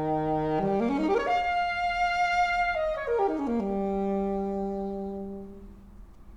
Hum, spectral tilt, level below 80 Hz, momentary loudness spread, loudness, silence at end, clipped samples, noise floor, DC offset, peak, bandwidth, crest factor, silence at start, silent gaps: none; -6.5 dB/octave; -48 dBFS; 10 LU; -28 LUFS; 0 s; under 0.1%; -47 dBFS; under 0.1%; -14 dBFS; 11 kHz; 14 dB; 0 s; none